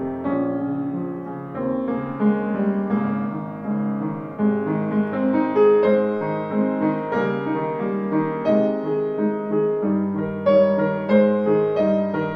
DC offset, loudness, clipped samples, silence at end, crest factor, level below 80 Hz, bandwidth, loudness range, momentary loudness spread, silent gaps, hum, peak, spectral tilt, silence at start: under 0.1%; -21 LUFS; under 0.1%; 0 s; 16 dB; -60 dBFS; 5.6 kHz; 4 LU; 9 LU; none; none; -6 dBFS; -10 dB/octave; 0 s